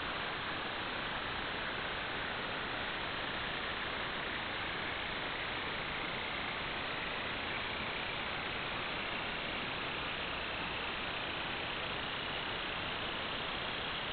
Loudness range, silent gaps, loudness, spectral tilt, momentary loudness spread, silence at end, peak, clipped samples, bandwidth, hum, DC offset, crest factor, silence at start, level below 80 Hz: 0 LU; none; -37 LUFS; -1 dB/octave; 0 LU; 0 s; -26 dBFS; under 0.1%; 4.9 kHz; none; under 0.1%; 14 dB; 0 s; -56 dBFS